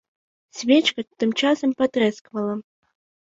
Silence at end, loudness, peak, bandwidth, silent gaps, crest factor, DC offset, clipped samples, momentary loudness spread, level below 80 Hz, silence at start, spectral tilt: 0.65 s; -22 LUFS; -4 dBFS; 7.8 kHz; 2.21-2.25 s; 18 dB; under 0.1%; under 0.1%; 11 LU; -68 dBFS; 0.55 s; -4 dB/octave